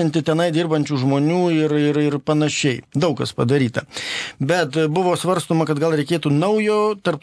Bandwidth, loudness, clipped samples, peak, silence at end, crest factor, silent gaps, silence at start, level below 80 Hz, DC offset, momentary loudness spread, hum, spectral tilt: 11 kHz; -19 LUFS; under 0.1%; -2 dBFS; 0.05 s; 16 dB; none; 0 s; -60 dBFS; under 0.1%; 4 LU; none; -6 dB/octave